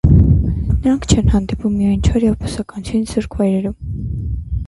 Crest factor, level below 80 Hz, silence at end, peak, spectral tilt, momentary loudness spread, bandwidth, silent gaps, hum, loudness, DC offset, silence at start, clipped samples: 16 dB; -22 dBFS; 0 s; 0 dBFS; -7 dB/octave; 10 LU; 11.5 kHz; none; none; -17 LUFS; under 0.1%; 0.05 s; under 0.1%